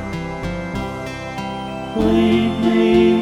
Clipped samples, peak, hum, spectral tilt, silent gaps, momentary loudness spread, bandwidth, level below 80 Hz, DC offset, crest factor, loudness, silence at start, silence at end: under 0.1%; -4 dBFS; none; -7 dB/octave; none; 13 LU; 11 kHz; -36 dBFS; under 0.1%; 14 dB; -19 LUFS; 0 s; 0 s